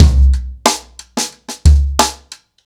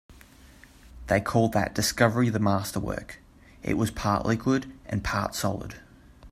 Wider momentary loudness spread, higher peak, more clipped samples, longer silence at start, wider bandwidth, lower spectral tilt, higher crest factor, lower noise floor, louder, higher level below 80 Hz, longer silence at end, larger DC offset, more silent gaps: second, 12 LU vs 15 LU; first, 0 dBFS vs -6 dBFS; neither; about the same, 0 s vs 0.1 s; about the same, 15.5 kHz vs 16 kHz; about the same, -4.5 dB/octave vs -5.5 dB/octave; second, 12 dB vs 22 dB; second, -40 dBFS vs -52 dBFS; first, -15 LUFS vs -27 LUFS; first, -14 dBFS vs -46 dBFS; first, 0.5 s vs 0 s; neither; neither